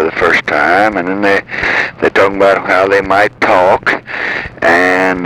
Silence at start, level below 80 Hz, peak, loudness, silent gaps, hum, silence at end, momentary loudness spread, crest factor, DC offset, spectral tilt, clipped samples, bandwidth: 0 s; -42 dBFS; 0 dBFS; -11 LUFS; none; none; 0 s; 5 LU; 10 dB; under 0.1%; -5 dB/octave; under 0.1%; 15.5 kHz